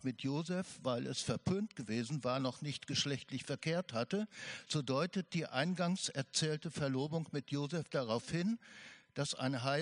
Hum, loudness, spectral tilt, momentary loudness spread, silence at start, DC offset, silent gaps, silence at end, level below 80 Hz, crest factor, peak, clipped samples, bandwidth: none; -38 LUFS; -5 dB/octave; 6 LU; 0 s; under 0.1%; none; 0 s; -72 dBFS; 20 dB; -18 dBFS; under 0.1%; 10.5 kHz